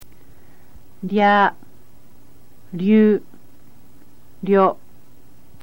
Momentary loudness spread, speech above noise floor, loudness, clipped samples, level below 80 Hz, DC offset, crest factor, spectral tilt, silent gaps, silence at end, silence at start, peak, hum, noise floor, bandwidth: 19 LU; 36 dB; -17 LUFS; under 0.1%; -58 dBFS; 2%; 18 dB; -8 dB/octave; none; 0.9 s; 0 s; -4 dBFS; 60 Hz at -60 dBFS; -52 dBFS; 16.5 kHz